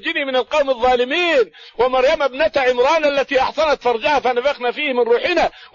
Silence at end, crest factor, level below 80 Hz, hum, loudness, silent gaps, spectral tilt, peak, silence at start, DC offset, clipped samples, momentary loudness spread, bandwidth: 0.1 s; 12 dB; -46 dBFS; none; -17 LUFS; none; -3 dB/octave; -4 dBFS; 0 s; under 0.1%; under 0.1%; 4 LU; 7.4 kHz